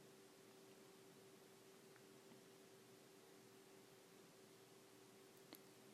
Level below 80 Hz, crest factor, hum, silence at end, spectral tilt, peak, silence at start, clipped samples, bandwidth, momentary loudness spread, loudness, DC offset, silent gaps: under -90 dBFS; 26 dB; none; 0 s; -3.5 dB/octave; -40 dBFS; 0 s; under 0.1%; 15 kHz; 3 LU; -65 LUFS; under 0.1%; none